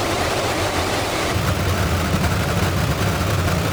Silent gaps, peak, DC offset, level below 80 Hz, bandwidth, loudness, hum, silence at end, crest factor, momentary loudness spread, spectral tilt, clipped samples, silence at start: none; -6 dBFS; under 0.1%; -30 dBFS; over 20 kHz; -20 LUFS; none; 0 s; 14 dB; 1 LU; -4.5 dB/octave; under 0.1%; 0 s